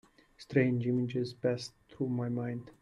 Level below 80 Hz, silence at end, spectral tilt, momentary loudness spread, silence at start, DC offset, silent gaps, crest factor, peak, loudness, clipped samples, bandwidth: -68 dBFS; 0.1 s; -7.5 dB/octave; 10 LU; 0.4 s; under 0.1%; none; 20 dB; -14 dBFS; -33 LUFS; under 0.1%; 11.5 kHz